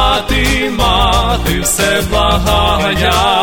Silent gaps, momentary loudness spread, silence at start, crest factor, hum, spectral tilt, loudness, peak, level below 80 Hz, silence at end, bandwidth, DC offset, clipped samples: none; 2 LU; 0 s; 12 dB; none; -3.5 dB/octave; -12 LUFS; 0 dBFS; -18 dBFS; 0 s; over 20 kHz; under 0.1%; under 0.1%